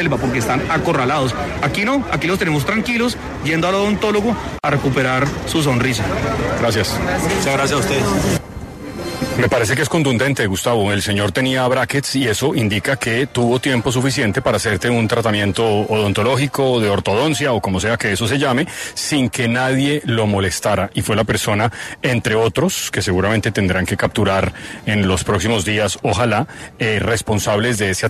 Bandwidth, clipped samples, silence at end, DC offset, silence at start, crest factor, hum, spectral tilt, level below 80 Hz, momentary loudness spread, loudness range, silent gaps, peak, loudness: 13.5 kHz; under 0.1%; 0 s; under 0.1%; 0 s; 14 dB; none; -5 dB/octave; -38 dBFS; 3 LU; 1 LU; none; -4 dBFS; -17 LUFS